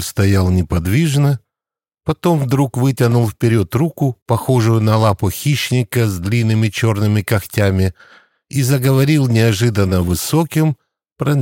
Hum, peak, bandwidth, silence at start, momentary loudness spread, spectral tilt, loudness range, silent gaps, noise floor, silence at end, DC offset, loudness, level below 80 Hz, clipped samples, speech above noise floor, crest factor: none; 0 dBFS; 17 kHz; 0 s; 6 LU; -6.5 dB/octave; 1 LU; 4.22-4.26 s; -89 dBFS; 0 s; under 0.1%; -16 LUFS; -40 dBFS; under 0.1%; 75 dB; 14 dB